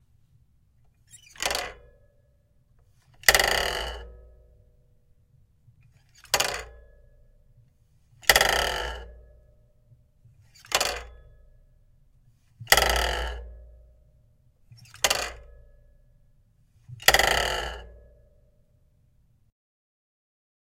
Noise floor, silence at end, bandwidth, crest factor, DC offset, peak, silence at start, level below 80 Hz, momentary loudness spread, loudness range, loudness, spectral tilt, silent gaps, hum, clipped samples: -63 dBFS; 2.85 s; 17 kHz; 30 dB; under 0.1%; 0 dBFS; 1.15 s; -44 dBFS; 20 LU; 7 LU; -24 LUFS; -1 dB/octave; none; none; under 0.1%